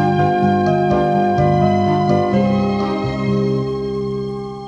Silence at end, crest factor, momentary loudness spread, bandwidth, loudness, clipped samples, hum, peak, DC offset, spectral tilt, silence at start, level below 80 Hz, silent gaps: 0 s; 14 dB; 7 LU; 7.8 kHz; -17 LUFS; under 0.1%; 50 Hz at -25 dBFS; -2 dBFS; under 0.1%; -8.5 dB/octave; 0 s; -40 dBFS; none